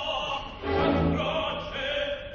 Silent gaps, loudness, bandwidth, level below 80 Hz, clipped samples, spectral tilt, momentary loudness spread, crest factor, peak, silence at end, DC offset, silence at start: none; -28 LUFS; 7.2 kHz; -40 dBFS; under 0.1%; -6 dB/octave; 7 LU; 16 dB; -12 dBFS; 0 s; under 0.1%; 0 s